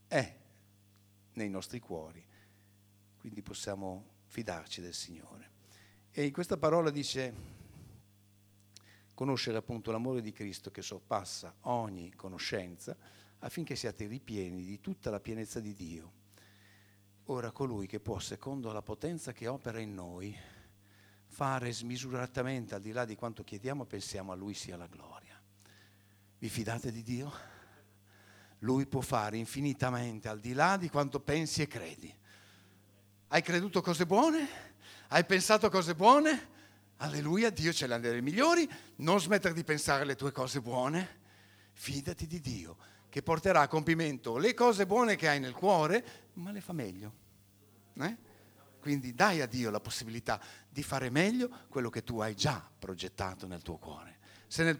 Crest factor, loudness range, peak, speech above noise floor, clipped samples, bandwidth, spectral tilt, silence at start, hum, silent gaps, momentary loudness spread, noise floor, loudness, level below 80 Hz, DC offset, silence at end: 26 dB; 14 LU; -8 dBFS; 31 dB; under 0.1%; over 20 kHz; -4.5 dB/octave; 0.1 s; none; none; 19 LU; -65 dBFS; -34 LUFS; -64 dBFS; under 0.1%; 0 s